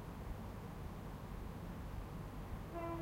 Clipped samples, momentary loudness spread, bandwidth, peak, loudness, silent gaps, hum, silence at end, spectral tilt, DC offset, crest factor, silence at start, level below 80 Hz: under 0.1%; 3 LU; 16 kHz; -30 dBFS; -49 LUFS; none; none; 0 s; -7 dB/octave; under 0.1%; 16 dB; 0 s; -52 dBFS